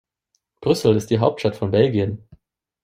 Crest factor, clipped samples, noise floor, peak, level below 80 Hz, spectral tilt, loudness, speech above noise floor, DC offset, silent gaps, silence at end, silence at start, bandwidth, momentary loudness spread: 18 dB; under 0.1%; -72 dBFS; -2 dBFS; -54 dBFS; -7 dB/octave; -20 LUFS; 54 dB; under 0.1%; none; 0.65 s; 0.6 s; 15.5 kHz; 9 LU